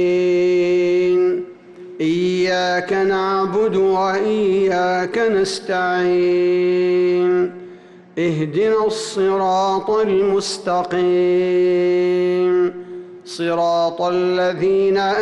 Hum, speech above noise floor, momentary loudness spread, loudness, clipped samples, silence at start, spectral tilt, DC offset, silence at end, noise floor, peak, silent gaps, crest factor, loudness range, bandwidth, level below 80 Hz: none; 24 dB; 5 LU; -17 LUFS; under 0.1%; 0 s; -5.5 dB/octave; under 0.1%; 0 s; -41 dBFS; -10 dBFS; none; 8 dB; 1 LU; 11.5 kHz; -58 dBFS